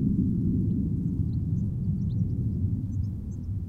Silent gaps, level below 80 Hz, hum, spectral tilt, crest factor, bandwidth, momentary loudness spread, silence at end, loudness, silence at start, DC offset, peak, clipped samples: none; -38 dBFS; none; -12 dB/octave; 14 dB; 1.4 kHz; 6 LU; 0 s; -29 LUFS; 0 s; under 0.1%; -14 dBFS; under 0.1%